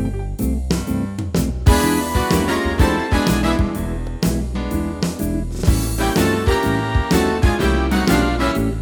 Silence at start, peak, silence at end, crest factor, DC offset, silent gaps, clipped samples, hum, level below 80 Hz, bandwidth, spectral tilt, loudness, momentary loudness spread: 0 s; -2 dBFS; 0 s; 16 dB; under 0.1%; none; under 0.1%; none; -24 dBFS; over 20 kHz; -5.5 dB/octave; -19 LUFS; 7 LU